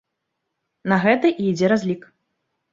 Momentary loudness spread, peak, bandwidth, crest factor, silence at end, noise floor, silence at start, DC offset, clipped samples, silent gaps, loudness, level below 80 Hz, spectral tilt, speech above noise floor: 12 LU; -2 dBFS; 7.6 kHz; 20 dB; 0.75 s; -78 dBFS; 0.85 s; under 0.1%; under 0.1%; none; -19 LUFS; -62 dBFS; -6.5 dB/octave; 59 dB